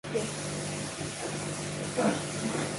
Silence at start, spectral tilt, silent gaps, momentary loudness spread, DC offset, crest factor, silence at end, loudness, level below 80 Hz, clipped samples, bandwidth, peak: 0.05 s; -4 dB/octave; none; 6 LU; under 0.1%; 16 dB; 0 s; -33 LUFS; -58 dBFS; under 0.1%; 11.5 kHz; -16 dBFS